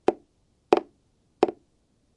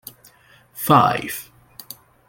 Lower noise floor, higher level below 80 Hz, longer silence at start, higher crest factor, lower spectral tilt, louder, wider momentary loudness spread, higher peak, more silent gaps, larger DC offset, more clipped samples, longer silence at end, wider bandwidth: first, -67 dBFS vs -52 dBFS; second, -68 dBFS vs -58 dBFS; second, 0.1 s vs 0.75 s; first, 28 dB vs 22 dB; about the same, -5.5 dB/octave vs -5 dB/octave; second, -26 LUFS vs -18 LUFS; second, 5 LU vs 26 LU; about the same, -2 dBFS vs -2 dBFS; neither; neither; neither; second, 0.65 s vs 0.85 s; second, 9.8 kHz vs 17 kHz